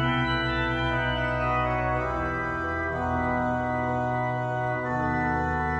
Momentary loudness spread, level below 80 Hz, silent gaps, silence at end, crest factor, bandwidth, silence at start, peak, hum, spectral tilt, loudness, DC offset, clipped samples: 3 LU; -40 dBFS; none; 0 s; 14 dB; 8.4 kHz; 0 s; -14 dBFS; none; -7 dB/octave; -27 LUFS; under 0.1%; under 0.1%